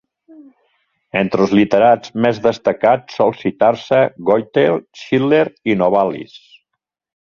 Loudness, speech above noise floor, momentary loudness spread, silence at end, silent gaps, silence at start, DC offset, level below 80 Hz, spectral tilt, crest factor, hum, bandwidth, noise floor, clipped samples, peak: -15 LUFS; 63 dB; 7 LU; 0.85 s; none; 1.15 s; under 0.1%; -56 dBFS; -7 dB/octave; 16 dB; none; 7.2 kHz; -78 dBFS; under 0.1%; 0 dBFS